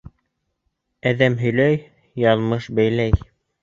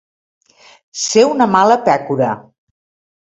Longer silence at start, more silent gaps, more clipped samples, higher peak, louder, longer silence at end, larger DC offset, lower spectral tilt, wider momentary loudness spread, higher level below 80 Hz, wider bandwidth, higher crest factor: about the same, 1.05 s vs 0.95 s; neither; neither; about the same, -2 dBFS vs 0 dBFS; second, -20 LUFS vs -13 LUFS; second, 0.45 s vs 0.85 s; neither; first, -8 dB/octave vs -4 dB/octave; second, 7 LU vs 12 LU; first, -36 dBFS vs -60 dBFS; second, 7.4 kHz vs 8.4 kHz; about the same, 18 dB vs 16 dB